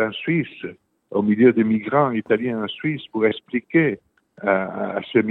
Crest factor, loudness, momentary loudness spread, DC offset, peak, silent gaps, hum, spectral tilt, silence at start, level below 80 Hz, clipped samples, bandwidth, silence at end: 18 dB; -21 LUFS; 11 LU; under 0.1%; -2 dBFS; none; none; -9.5 dB/octave; 0 s; -66 dBFS; under 0.1%; 4.1 kHz; 0 s